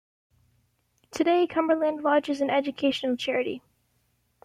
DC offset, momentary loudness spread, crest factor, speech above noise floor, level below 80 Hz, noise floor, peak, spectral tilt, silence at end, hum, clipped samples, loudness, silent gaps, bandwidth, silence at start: under 0.1%; 7 LU; 16 dB; 46 dB; -70 dBFS; -70 dBFS; -10 dBFS; -4 dB/octave; 0.85 s; 60 Hz at -60 dBFS; under 0.1%; -25 LUFS; none; 14 kHz; 1.15 s